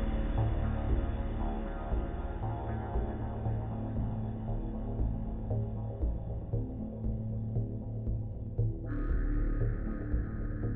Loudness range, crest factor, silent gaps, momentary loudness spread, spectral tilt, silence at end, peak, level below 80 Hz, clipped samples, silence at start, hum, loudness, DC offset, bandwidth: 1 LU; 14 dB; none; 4 LU; -9.5 dB/octave; 0 s; -20 dBFS; -36 dBFS; under 0.1%; 0 s; none; -36 LUFS; under 0.1%; 3.8 kHz